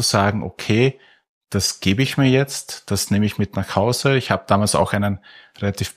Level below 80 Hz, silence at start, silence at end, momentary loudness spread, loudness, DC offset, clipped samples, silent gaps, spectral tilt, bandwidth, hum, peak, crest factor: -50 dBFS; 0 s; 0.05 s; 9 LU; -20 LUFS; under 0.1%; under 0.1%; 1.29-1.41 s; -4.5 dB/octave; 15.5 kHz; none; -2 dBFS; 18 dB